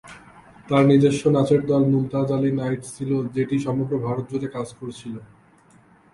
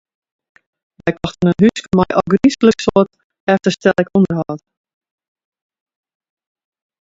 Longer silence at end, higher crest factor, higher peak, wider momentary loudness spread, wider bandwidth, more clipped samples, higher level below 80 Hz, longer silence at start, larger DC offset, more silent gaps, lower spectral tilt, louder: second, 0.9 s vs 2.45 s; about the same, 18 dB vs 16 dB; second, -4 dBFS vs 0 dBFS; first, 16 LU vs 10 LU; first, 11.5 kHz vs 7.8 kHz; neither; second, -56 dBFS vs -48 dBFS; second, 0.05 s vs 1.05 s; neither; second, none vs 3.24-3.30 s, 3.40-3.47 s; about the same, -7.5 dB/octave vs -6.5 dB/octave; second, -21 LUFS vs -15 LUFS